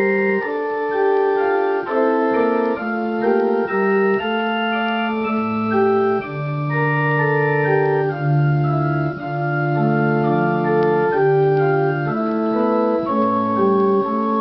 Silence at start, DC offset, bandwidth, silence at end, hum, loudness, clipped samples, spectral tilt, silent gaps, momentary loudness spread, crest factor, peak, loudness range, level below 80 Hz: 0 s; under 0.1%; 5.8 kHz; 0 s; none; -18 LUFS; under 0.1%; -6.5 dB/octave; none; 4 LU; 14 dB; -4 dBFS; 1 LU; -54 dBFS